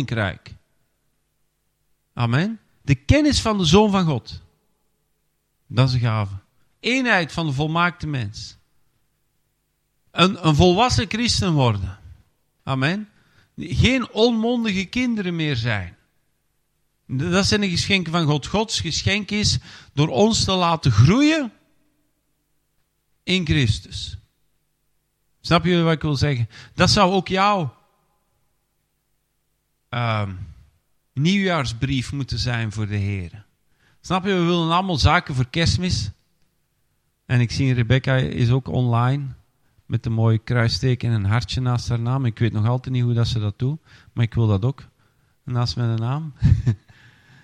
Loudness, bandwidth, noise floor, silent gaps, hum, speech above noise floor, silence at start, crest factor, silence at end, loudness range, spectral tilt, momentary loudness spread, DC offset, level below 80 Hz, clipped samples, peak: -20 LUFS; 10.5 kHz; -70 dBFS; none; none; 51 dB; 0 s; 20 dB; 0.7 s; 5 LU; -5.5 dB/octave; 14 LU; under 0.1%; -40 dBFS; under 0.1%; 0 dBFS